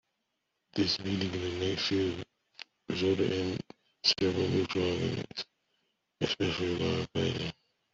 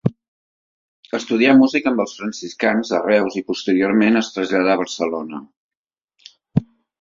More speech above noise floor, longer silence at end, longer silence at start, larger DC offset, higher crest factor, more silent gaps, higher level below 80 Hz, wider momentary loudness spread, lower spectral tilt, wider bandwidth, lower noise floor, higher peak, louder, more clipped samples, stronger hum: second, 51 dB vs over 72 dB; about the same, 0.4 s vs 0.4 s; first, 0.75 s vs 0.05 s; neither; about the same, 20 dB vs 18 dB; second, none vs 0.28-1.03 s, 5.57-5.69 s, 5.77-5.84 s, 6.04-6.08 s; about the same, -62 dBFS vs -58 dBFS; about the same, 13 LU vs 14 LU; about the same, -5 dB/octave vs -5.5 dB/octave; about the same, 7.8 kHz vs 7.6 kHz; second, -82 dBFS vs under -90 dBFS; second, -12 dBFS vs -2 dBFS; second, -31 LUFS vs -18 LUFS; neither; neither